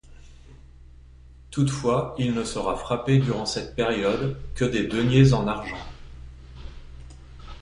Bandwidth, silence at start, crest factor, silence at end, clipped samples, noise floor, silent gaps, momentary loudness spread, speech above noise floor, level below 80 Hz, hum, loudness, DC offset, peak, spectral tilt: 11 kHz; 0.05 s; 20 dB; 0 s; under 0.1%; -47 dBFS; none; 26 LU; 25 dB; -42 dBFS; none; -24 LUFS; under 0.1%; -6 dBFS; -6.5 dB/octave